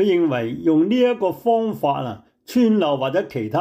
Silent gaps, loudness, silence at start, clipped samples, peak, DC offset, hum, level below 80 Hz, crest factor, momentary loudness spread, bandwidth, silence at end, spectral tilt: none; -20 LUFS; 0 s; under 0.1%; -8 dBFS; under 0.1%; none; -62 dBFS; 12 dB; 7 LU; 16 kHz; 0 s; -7 dB/octave